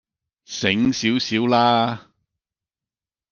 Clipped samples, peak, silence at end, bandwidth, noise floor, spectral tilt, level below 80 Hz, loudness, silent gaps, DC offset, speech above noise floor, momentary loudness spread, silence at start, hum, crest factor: under 0.1%; -2 dBFS; 1.3 s; 7.2 kHz; under -90 dBFS; -4.5 dB/octave; -58 dBFS; -19 LUFS; none; under 0.1%; over 71 dB; 11 LU; 0.5 s; none; 20 dB